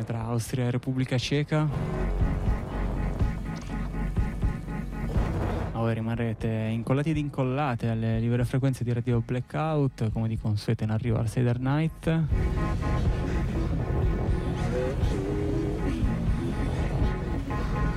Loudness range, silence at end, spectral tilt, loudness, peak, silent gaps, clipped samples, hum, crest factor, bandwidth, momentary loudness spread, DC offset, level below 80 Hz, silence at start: 3 LU; 0 s; -7.5 dB/octave; -28 LUFS; -16 dBFS; none; under 0.1%; none; 12 dB; 13.5 kHz; 5 LU; under 0.1%; -32 dBFS; 0 s